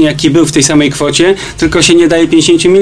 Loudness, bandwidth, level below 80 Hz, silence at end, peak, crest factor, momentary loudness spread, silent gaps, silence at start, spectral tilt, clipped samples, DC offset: -8 LUFS; 11 kHz; -34 dBFS; 0 s; 0 dBFS; 8 dB; 4 LU; none; 0 s; -4 dB/octave; 0.5%; 1%